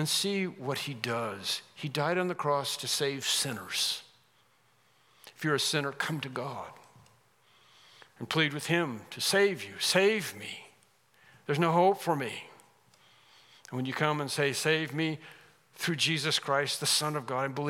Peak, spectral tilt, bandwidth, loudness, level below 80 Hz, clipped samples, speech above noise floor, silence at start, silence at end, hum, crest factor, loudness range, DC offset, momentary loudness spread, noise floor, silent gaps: -10 dBFS; -3.5 dB/octave; 17 kHz; -30 LUFS; -84 dBFS; under 0.1%; 37 dB; 0 s; 0 s; none; 22 dB; 5 LU; under 0.1%; 12 LU; -67 dBFS; none